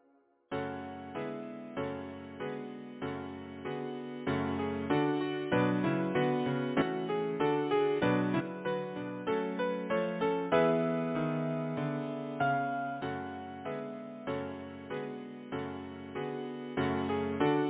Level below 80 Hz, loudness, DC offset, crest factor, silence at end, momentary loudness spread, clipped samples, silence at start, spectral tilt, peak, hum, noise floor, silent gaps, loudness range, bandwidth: -62 dBFS; -34 LUFS; under 0.1%; 20 dB; 0 s; 12 LU; under 0.1%; 0.5 s; -5.5 dB/octave; -14 dBFS; none; -68 dBFS; none; 9 LU; 4 kHz